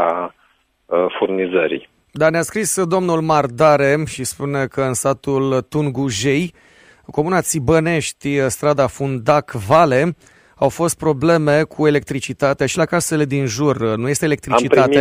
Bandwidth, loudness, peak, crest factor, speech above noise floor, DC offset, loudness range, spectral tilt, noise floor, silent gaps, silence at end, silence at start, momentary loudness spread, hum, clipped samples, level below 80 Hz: 16 kHz; -17 LUFS; 0 dBFS; 18 dB; 42 dB; under 0.1%; 3 LU; -5 dB/octave; -59 dBFS; none; 0 s; 0 s; 8 LU; none; under 0.1%; -48 dBFS